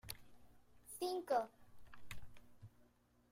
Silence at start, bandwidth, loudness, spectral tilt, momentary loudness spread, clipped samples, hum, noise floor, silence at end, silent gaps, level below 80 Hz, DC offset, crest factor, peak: 0.05 s; 16 kHz; -43 LUFS; -4 dB/octave; 26 LU; under 0.1%; none; -73 dBFS; 0.45 s; none; -68 dBFS; under 0.1%; 22 dB; -26 dBFS